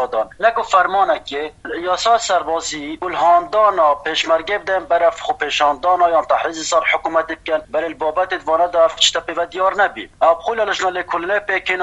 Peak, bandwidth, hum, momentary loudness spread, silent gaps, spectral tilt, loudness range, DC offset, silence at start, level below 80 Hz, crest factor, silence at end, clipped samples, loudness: 0 dBFS; 10.5 kHz; none; 8 LU; none; -1.5 dB/octave; 1 LU; under 0.1%; 0 s; -50 dBFS; 16 dB; 0 s; under 0.1%; -17 LUFS